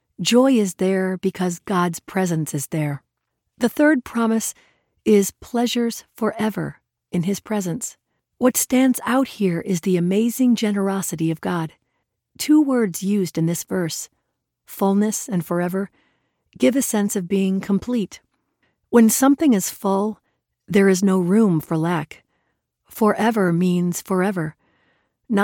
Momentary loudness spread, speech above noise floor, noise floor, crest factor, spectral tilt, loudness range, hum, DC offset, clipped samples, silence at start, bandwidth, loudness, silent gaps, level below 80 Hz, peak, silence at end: 11 LU; 58 dB; -77 dBFS; 16 dB; -5.5 dB/octave; 4 LU; none; under 0.1%; under 0.1%; 0.2 s; 17.5 kHz; -20 LUFS; none; -60 dBFS; -4 dBFS; 0 s